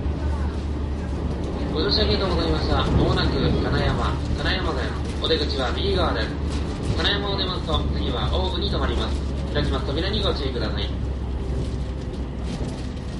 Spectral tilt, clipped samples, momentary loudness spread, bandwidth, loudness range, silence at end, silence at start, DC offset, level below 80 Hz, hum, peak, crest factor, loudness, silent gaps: -6.5 dB/octave; under 0.1%; 8 LU; 11.5 kHz; 4 LU; 0 s; 0 s; under 0.1%; -28 dBFS; none; -6 dBFS; 16 dB; -24 LUFS; none